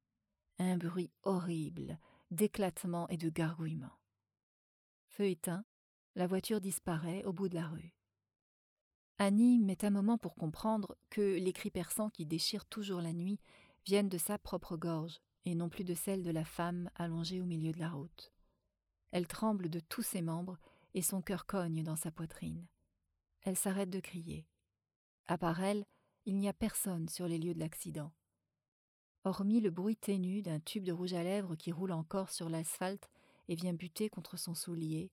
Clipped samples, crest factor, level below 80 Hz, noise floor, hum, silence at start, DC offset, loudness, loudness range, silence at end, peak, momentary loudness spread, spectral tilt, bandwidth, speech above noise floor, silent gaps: under 0.1%; 18 dB; -68 dBFS; -88 dBFS; none; 0.6 s; under 0.1%; -38 LUFS; 6 LU; 0.05 s; -20 dBFS; 12 LU; -5.5 dB/octave; 19 kHz; 50 dB; 4.43-5.08 s, 5.64-6.14 s, 8.42-9.15 s, 24.96-25.24 s, 28.68-29.22 s